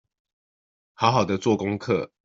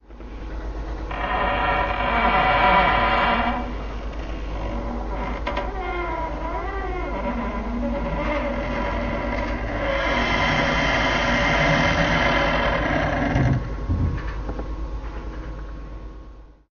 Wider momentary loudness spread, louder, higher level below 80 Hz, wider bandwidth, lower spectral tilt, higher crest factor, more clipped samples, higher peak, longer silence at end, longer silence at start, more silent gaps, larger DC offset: second, 5 LU vs 15 LU; about the same, -23 LUFS vs -23 LUFS; second, -60 dBFS vs -30 dBFS; first, 7.8 kHz vs 7 kHz; first, -5 dB/octave vs -3.5 dB/octave; about the same, 22 dB vs 18 dB; neither; about the same, -4 dBFS vs -6 dBFS; about the same, 0.2 s vs 0.2 s; first, 1 s vs 0.1 s; neither; neither